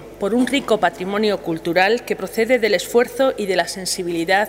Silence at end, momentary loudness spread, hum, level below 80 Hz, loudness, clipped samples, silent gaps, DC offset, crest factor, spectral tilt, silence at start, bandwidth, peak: 0 s; 5 LU; 50 Hz at -50 dBFS; -52 dBFS; -19 LUFS; under 0.1%; none; under 0.1%; 18 dB; -3.5 dB/octave; 0 s; 16 kHz; -2 dBFS